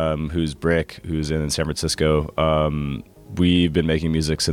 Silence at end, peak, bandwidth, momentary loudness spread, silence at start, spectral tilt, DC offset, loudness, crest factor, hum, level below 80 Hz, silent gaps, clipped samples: 0 s; -6 dBFS; 15.5 kHz; 9 LU; 0 s; -5.5 dB/octave; under 0.1%; -21 LUFS; 16 dB; none; -34 dBFS; none; under 0.1%